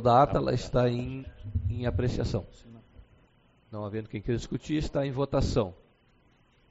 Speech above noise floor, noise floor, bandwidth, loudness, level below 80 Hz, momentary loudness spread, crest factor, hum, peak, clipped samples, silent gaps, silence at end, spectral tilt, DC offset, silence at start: 36 dB; -64 dBFS; 8 kHz; -30 LUFS; -42 dBFS; 11 LU; 20 dB; none; -10 dBFS; under 0.1%; none; 0.95 s; -6.5 dB/octave; under 0.1%; 0 s